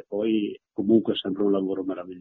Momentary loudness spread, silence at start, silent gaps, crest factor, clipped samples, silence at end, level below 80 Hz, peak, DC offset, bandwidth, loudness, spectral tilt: 9 LU; 0.1 s; none; 18 dB; under 0.1%; 0 s; -66 dBFS; -8 dBFS; under 0.1%; 4.1 kHz; -25 LUFS; -5.5 dB/octave